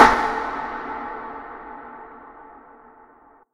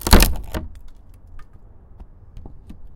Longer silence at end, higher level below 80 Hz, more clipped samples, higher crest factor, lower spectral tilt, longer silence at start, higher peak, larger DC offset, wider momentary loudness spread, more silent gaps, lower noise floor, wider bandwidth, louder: first, 1 s vs 0.05 s; second, -46 dBFS vs -24 dBFS; neither; about the same, 24 dB vs 20 dB; about the same, -3.5 dB/octave vs -4 dB/octave; about the same, 0 s vs 0.05 s; about the same, 0 dBFS vs 0 dBFS; neither; second, 21 LU vs 29 LU; neither; first, -52 dBFS vs -43 dBFS; second, 14.5 kHz vs 17 kHz; second, -24 LUFS vs -20 LUFS